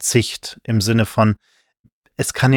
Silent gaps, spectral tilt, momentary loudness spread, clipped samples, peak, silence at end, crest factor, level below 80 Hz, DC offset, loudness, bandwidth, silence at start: 1.79-1.84 s, 1.92-2.02 s; -5 dB/octave; 12 LU; under 0.1%; 0 dBFS; 0 s; 18 dB; -48 dBFS; under 0.1%; -19 LUFS; 17.5 kHz; 0 s